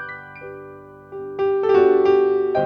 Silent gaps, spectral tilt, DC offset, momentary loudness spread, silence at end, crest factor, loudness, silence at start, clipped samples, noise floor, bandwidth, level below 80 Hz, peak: none; -8 dB/octave; under 0.1%; 21 LU; 0 s; 16 dB; -17 LUFS; 0 s; under 0.1%; -40 dBFS; 5.4 kHz; -60 dBFS; -4 dBFS